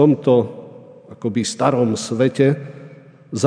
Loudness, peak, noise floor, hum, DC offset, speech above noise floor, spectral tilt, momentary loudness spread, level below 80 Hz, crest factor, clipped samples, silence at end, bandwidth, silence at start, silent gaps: -18 LUFS; 0 dBFS; -42 dBFS; none; under 0.1%; 25 dB; -6 dB/octave; 17 LU; -64 dBFS; 18 dB; under 0.1%; 0 s; 10 kHz; 0 s; none